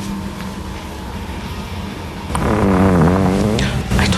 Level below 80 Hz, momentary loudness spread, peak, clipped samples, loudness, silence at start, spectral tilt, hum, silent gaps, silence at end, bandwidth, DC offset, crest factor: -28 dBFS; 15 LU; -2 dBFS; under 0.1%; -18 LUFS; 0 s; -6 dB/octave; none; none; 0 s; 13.5 kHz; under 0.1%; 14 dB